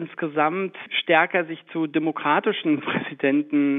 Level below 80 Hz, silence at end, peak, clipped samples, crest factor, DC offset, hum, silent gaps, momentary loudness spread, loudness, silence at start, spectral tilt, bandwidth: -80 dBFS; 0 s; -4 dBFS; under 0.1%; 18 dB; under 0.1%; none; none; 8 LU; -23 LUFS; 0 s; -8.5 dB/octave; 3.9 kHz